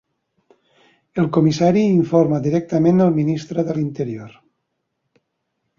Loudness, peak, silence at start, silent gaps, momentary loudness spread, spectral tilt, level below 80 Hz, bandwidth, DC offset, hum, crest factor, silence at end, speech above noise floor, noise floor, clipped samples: -18 LUFS; -2 dBFS; 1.15 s; none; 11 LU; -8 dB/octave; -58 dBFS; 7.2 kHz; under 0.1%; none; 16 dB; 1.5 s; 57 dB; -74 dBFS; under 0.1%